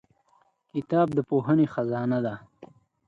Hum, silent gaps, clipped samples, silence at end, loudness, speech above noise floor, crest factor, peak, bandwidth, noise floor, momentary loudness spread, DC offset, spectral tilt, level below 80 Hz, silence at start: none; none; under 0.1%; 0.45 s; -26 LUFS; 41 dB; 16 dB; -12 dBFS; 7 kHz; -66 dBFS; 12 LU; under 0.1%; -10 dB/octave; -66 dBFS; 0.75 s